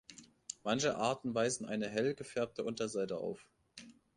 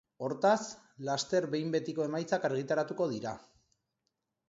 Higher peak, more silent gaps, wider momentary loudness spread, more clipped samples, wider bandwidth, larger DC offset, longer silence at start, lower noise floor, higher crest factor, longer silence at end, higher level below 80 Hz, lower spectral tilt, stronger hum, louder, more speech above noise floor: second, -18 dBFS vs -14 dBFS; neither; first, 21 LU vs 12 LU; neither; first, 11 kHz vs 8 kHz; neither; about the same, 0.1 s vs 0.2 s; second, -58 dBFS vs -84 dBFS; about the same, 20 dB vs 20 dB; second, 0.25 s vs 1.1 s; about the same, -74 dBFS vs -76 dBFS; about the same, -4 dB/octave vs -5 dB/octave; neither; second, -37 LUFS vs -33 LUFS; second, 21 dB vs 52 dB